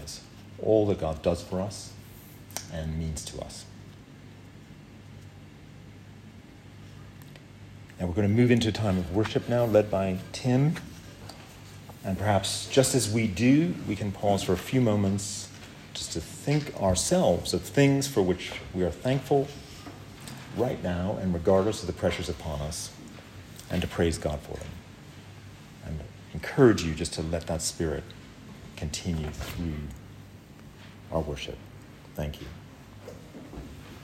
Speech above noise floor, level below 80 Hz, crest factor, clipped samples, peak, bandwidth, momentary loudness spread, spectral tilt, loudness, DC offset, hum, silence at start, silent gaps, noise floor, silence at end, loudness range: 21 dB; -50 dBFS; 22 dB; under 0.1%; -6 dBFS; 16 kHz; 24 LU; -5.5 dB/octave; -28 LUFS; under 0.1%; none; 0 s; none; -48 dBFS; 0 s; 13 LU